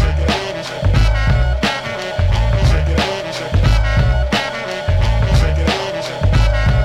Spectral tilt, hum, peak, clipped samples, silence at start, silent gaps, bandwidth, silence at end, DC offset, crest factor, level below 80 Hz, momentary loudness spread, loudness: -6 dB/octave; none; -2 dBFS; under 0.1%; 0 s; none; 11.5 kHz; 0 s; under 0.1%; 14 dB; -18 dBFS; 6 LU; -17 LUFS